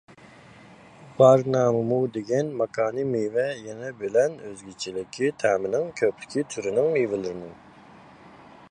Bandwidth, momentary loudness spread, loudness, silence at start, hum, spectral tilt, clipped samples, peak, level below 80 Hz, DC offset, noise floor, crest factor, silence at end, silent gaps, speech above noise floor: 11 kHz; 15 LU; -24 LUFS; 0.7 s; none; -6 dB/octave; under 0.1%; -4 dBFS; -64 dBFS; under 0.1%; -49 dBFS; 20 dB; 0.35 s; none; 25 dB